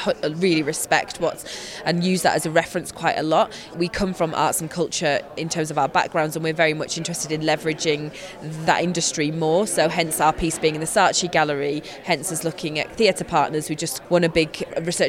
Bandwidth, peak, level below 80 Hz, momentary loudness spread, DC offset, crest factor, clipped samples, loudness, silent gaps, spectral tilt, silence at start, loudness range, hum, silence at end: 17 kHz; -4 dBFS; -48 dBFS; 7 LU; under 0.1%; 18 dB; under 0.1%; -22 LUFS; none; -3.5 dB/octave; 0 s; 2 LU; none; 0 s